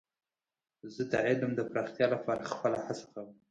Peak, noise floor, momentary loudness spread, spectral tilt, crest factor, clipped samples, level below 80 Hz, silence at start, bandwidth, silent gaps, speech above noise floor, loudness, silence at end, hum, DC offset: -14 dBFS; under -90 dBFS; 17 LU; -6 dB/octave; 20 dB; under 0.1%; -72 dBFS; 0.85 s; 9.2 kHz; none; over 57 dB; -33 LUFS; 0.15 s; none; under 0.1%